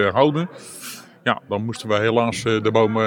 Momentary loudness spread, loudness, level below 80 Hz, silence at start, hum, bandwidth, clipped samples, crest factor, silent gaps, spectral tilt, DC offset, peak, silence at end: 16 LU; -21 LUFS; -62 dBFS; 0 s; none; 19.5 kHz; under 0.1%; 18 dB; none; -5.5 dB/octave; under 0.1%; -2 dBFS; 0 s